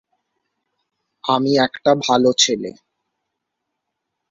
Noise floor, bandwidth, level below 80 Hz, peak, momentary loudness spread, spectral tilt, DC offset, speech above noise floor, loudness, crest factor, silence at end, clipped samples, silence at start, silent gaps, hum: -78 dBFS; 7.8 kHz; -62 dBFS; -2 dBFS; 12 LU; -3 dB/octave; under 0.1%; 62 dB; -17 LUFS; 20 dB; 1.6 s; under 0.1%; 1.25 s; none; none